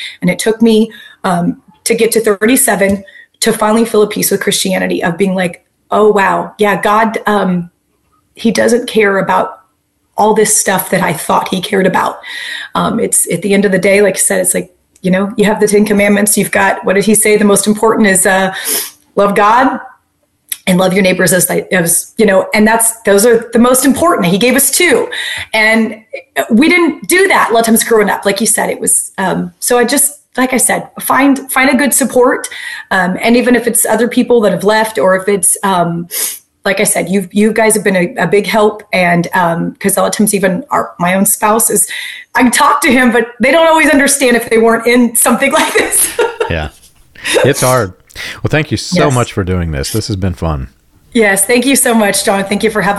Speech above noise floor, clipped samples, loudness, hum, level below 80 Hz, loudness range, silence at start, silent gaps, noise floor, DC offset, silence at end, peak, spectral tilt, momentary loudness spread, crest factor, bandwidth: 49 dB; under 0.1%; -10 LUFS; none; -40 dBFS; 4 LU; 0 s; none; -60 dBFS; under 0.1%; 0 s; 0 dBFS; -3.5 dB/octave; 8 LU; 10 dB; 13 kHz